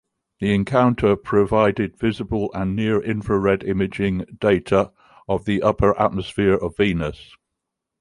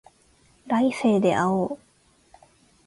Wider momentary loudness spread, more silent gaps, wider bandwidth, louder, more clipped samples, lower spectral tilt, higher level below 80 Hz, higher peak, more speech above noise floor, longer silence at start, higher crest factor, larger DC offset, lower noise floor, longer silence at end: about the same, 7 LU vs 9 LU; neither; about the same, 11 kHz vs 11.5 kHz; about the same, -21 LUFS vs -23 LUFS; neither; about the same, -7.5 dB/octave vs -6.5 dB/octave; first, -42 dBFS vs -62 dBFS; first, -2 dBFS vs -8 dBFS; first, 62 dB vs 38 dB; second, 0.4 s vs 0.65 s; about the same, 18 dB vs 16 dB; neither; first, -81 dBFS vs -60 dBFS; second, 0.8 s vs 1.1 s